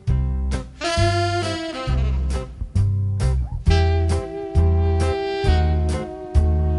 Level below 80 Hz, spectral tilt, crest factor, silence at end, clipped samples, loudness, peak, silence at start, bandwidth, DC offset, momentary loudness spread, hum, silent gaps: -24 dBFS; -6.5 dB/octave; 16 dB; 0 s; under 0.1%; -22 LUFS; -4 dBFS; 0.05 s; 11.5 kHz; under 0.1%; 7 LU; none; none